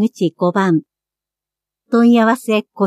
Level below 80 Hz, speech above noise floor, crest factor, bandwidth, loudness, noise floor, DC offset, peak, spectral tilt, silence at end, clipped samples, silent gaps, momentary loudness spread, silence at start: -74 dBFS; 73 dB; 14 dB; 13.5 kHz; -15 LUFS; -87 dBFS; under 0.1%; -2 dBFS; -6.5 dB/octave; 0 s; under 0.1%; none; 8 LU; 0 s